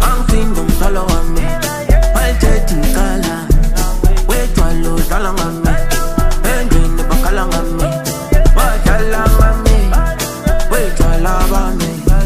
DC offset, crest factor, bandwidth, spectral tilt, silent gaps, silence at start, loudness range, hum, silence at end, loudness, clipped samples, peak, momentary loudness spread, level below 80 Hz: under 0.1%; 10 dB; 15.5 kHz; -5 dB/octave; none; 0 s; 2 LU; none; 0 s; -15 LUFS; under 0.1%; 0 dBFS; 4 LU; -12 dBFS